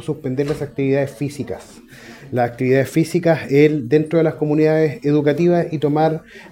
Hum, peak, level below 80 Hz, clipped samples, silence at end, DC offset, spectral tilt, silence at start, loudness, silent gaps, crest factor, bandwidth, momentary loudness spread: none; 0 dBFS; -54 dBFS; under 0.1%; 0.05 s; under 0.1%; -7.5 dB/octave; 0 s; -18 LUFS; none; 18 dB; 16.5 kHz; 11 LU